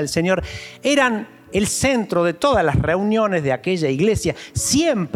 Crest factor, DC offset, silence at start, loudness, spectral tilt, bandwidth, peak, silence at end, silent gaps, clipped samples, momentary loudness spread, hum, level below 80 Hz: 16 dB; under 0.1%; 0 s; -19 LUFS; -4.5 dB/octave; 16.5 kHz; -4 dBFS; 0 s; none; under 0.1%; 6 LU; none; -40 dBFS